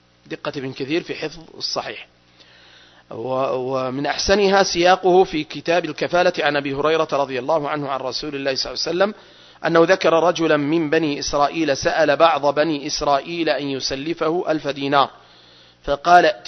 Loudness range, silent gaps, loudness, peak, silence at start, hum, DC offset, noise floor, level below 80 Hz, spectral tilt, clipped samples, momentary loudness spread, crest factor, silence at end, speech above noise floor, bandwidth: 7 LU; none; -19 LUFS; 0 dBFS; 0.3 s; 60 Hz at -55 dBFS; under 0.1%; -50 dBFS; -48 dBFS; -4 dB/octave; under 0.1%; 12 LU; 20 dB; 0 s; 31 dB; 6.4 kHz